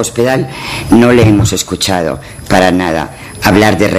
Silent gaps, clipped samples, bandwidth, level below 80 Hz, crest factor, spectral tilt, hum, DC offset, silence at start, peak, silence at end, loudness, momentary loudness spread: none; 0.4%; 14.5 kHz; -32 dBFS; 10 dB; -5 dB/octave; none; under 0.1%; 0 s; 0 dBFS; 0 s; -10 LUFS; 11 LU